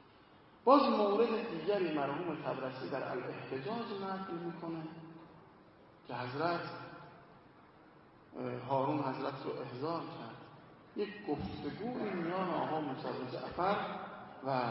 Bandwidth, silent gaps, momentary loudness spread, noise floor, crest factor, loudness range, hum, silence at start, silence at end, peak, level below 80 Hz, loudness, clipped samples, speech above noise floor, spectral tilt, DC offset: 5.8 kHz; none; 17 LU; -61 dBFS; 26 dB; 10 LU; none; 0.05 s; 0 s; -10 dBFS; -70 dBFS; -37 LUFS; under 0.1%; 25 dB; -5 dB/octave; under 0.1%